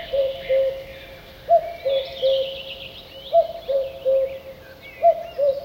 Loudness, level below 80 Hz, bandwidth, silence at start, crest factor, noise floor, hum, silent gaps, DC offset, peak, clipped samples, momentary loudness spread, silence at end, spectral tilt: -22 LUFS; -52 dBFS; 16.5 kHz; 0 s; 16 dB; -41 dBFS; none; none; under 0.1%; -8 dBFS; under 0.1%; 19 LU; 0 s; -4.5 dB/octave